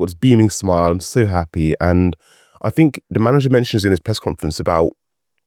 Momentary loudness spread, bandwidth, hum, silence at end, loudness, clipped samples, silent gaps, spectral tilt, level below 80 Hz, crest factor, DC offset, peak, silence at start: 8 LU; 16 kHz; none; 0.55 s; -16 LUFS; under 0.1%; none; -6.5 dB/octave; -40 dBFS; 16 dB; under 0.1%; 0 dBFS; 0 s